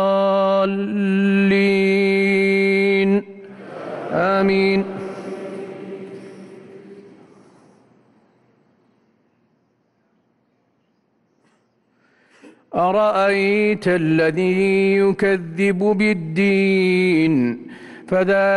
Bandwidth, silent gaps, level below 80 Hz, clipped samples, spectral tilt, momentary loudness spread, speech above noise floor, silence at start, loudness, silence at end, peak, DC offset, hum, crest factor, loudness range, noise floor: 11.5 kHz; none; -60 dBFS; under 0.1%; -7 dB/octave; 17 LU; 48 dB; 0 s; -17 LUFS; 0 s; -8 dBFS; under 0.1%; none; 12 dB; 14 LU; -65 dBFS